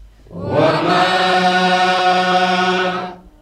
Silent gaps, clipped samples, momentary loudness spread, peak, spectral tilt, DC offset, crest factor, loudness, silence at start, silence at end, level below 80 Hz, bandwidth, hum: none; under 0.1%; 8 LU; -2 dBFS; -4.5 dB/octave; under 0.1%; 12 dB; -14 LUFS; 0 s; 0.25 s; -50 dBFS; 12.5 kHz; none